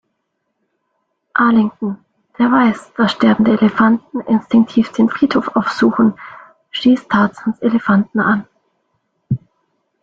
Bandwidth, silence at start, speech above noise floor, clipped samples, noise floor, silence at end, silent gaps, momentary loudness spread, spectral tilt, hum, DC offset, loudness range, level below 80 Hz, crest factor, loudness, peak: 7.6 kHz; 1.35 s; 57 dB; under 0.1%; -71 dBFS; 0.65 s; none; 11 LU; -7 dB/octave; none; under 0.1%; 3 LU; -54 dBFS; 16 dB; -15 LUFS; 0 dBFS